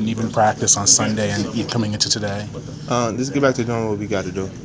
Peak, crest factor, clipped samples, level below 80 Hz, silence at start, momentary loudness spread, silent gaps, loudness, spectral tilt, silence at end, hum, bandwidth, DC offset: -2 dBFS; 18 dB; under 0.1%; -46 dBFS; 0 s; 12 LU; none; -18 LUFS; -3.5 dB/octave; 0 s; none; 8 kHz; under 0.1%